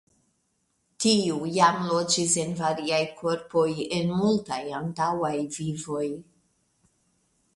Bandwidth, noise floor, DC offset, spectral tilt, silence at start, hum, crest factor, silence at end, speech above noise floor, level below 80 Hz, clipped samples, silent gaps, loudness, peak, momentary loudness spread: 11.5 kHz; -73 dBFS; under 0.1%; -4 dB/octave; 1 s; none; 20 dB; 1.35 s; 47 dB; -64 dBFS; under 0.1%; none; -26 LUFS; -6 dBFS; 9 LU